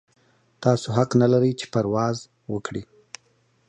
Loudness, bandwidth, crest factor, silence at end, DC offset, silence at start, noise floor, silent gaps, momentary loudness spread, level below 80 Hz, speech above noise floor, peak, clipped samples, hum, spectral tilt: -23 LUFS; 9.6 kHz; 20 dB; 0.85 s; under 0.1%; 0.6 s; -64 dBFS; none; 24 LU; -58 dBFS; 42 dB; -4 dBFS; under 0.1%; none; -7 dB/octave